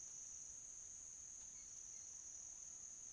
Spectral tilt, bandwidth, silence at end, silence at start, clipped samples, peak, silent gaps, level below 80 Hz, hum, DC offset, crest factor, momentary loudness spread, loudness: 0.5 dB/octave; 11 kHz; 0 s; 0 s; under 0.1%; -42 dBFS; none; -78 dBFS; none; under 0.1%; 14 dB; 1 LU; -52 LUFS